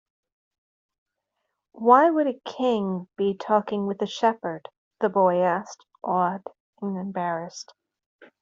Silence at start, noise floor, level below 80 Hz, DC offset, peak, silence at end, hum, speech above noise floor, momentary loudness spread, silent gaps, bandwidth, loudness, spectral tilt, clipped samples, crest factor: 1.75 s; -80 dBFS; -74 dBFS; under 0.1%; -4 dBFS; 0.15 s; none; 57 dB; 19 LU; 4.78-4.91 s, 6.60-6.73 s, 8.06-8.19 s; 7.8 kHz; -24 LUFS; -6 dB/octave; under 0.1%; 22 dB